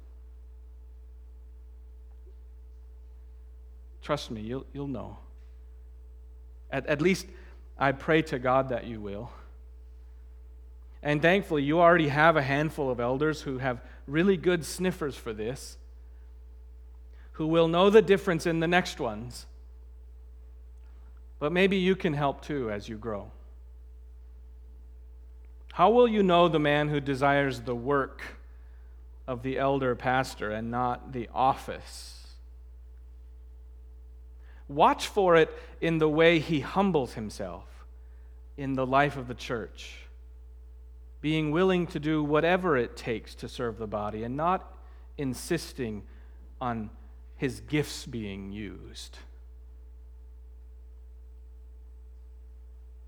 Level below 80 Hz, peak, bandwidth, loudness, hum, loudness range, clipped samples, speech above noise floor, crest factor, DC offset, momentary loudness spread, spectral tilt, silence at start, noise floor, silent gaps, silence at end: -48 dBFS; -6 dBFS; 18 kHz; -27 LUFS; 60 Hz at -45 dBFS; 14 LU; under 0.1%; 20 dB; 24 dB; under 0.1%; 21 LU; -6 dB/octave; 0 s; -47 dBFS; none; 0 s